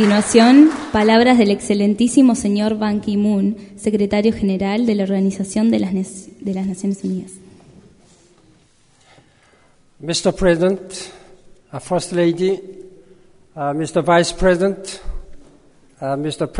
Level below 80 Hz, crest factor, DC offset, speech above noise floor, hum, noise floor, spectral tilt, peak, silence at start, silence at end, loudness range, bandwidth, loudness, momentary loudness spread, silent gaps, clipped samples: -40 dBFS; 18 dB; under 0.1%; 38 dB; none; -54 dBFS; -5.5 dB/octave; 0 dBFS; 0 s; 0 s; 12 LU; 11 kHz; -17 LUFS; 17 LU; none; under 0.1%